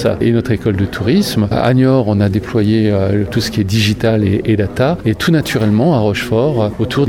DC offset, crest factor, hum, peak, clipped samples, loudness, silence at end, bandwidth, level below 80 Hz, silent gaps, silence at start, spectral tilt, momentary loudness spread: under 0.1%; 12 dB; none; 0 dBFS; under 0.1%; -14 LUFS; 0 s; 16.5 kHz; -36 dBFS; none; 0 s; -6.5 dB/octave; 4 LU